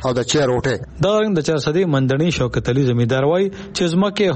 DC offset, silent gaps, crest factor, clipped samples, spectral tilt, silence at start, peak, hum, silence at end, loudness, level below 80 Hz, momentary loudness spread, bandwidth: under 0.1%; none; 10 dB; under 0.1%; -6 dB/octave; 0 s; -6 dBFS; none; 0 s; -18 LUFS; -42 dBFS; 4 LU; 8.8 kHz